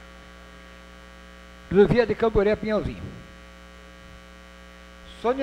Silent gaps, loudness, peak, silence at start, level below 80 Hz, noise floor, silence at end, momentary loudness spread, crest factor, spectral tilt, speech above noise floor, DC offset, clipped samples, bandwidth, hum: none; -22 LUFS; -6 dBFS; 0.15 s; -42 dBFS; -46 dBFS; 0 s; 26 LU; 20 dB; -7.5 dB/octave; 25 dB; under 0.1%; under 0.1%; 9.8 kHz; none